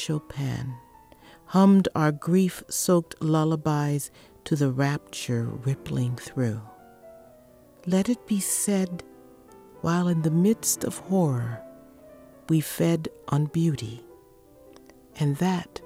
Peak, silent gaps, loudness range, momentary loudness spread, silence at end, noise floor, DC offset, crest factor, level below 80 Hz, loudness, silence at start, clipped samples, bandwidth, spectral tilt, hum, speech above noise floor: -8 dBFS; none; 5 LU; 11 LU; 0 s; -53 dBFS; under 0.1%; 18 dB; -58 dBFS; -25 LUFS; 0 s; under 0.1%; 16.5 kHz; -6 dB/octave; none; 29 dB